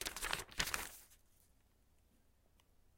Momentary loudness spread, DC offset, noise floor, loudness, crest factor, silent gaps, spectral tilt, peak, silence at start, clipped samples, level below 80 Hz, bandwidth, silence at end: 12 LU; under 0.1%; -72 dBFS; -41 LUFS; 32 dB; none; -0.5 dB/octave; -16 dBFS; 0 s; under 0.1%; -60 dBFS; 17 kHz; 1.8 s